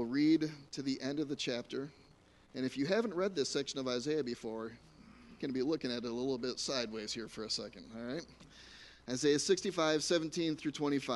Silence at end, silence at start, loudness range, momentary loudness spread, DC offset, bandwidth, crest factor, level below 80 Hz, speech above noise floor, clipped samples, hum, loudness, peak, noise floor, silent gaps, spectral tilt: 0 s; 0 s; 4 LU; 15 LU; under 0.1%; 11.5 kHz; 18 dB; -68 dBFS; 28 dB; under 0.1%; none; -36 LUFS; -18 dBFS; -64 dBFS; none; -4 dB/octave